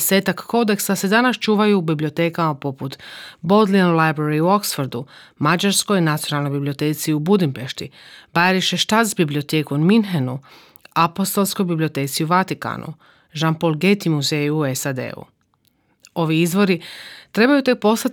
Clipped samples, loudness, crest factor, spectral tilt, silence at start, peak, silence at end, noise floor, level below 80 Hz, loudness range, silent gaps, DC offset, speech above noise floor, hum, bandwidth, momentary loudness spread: under 0.1%; -19 LUFS; 16 dB; -5 dB/octave; 0 s; -2 dBFS; 0 s; -63 dBFS; -66 dBFS; 3 LU; none; under 0.1%; 45 dB; none; over 20 kHz; 14 LU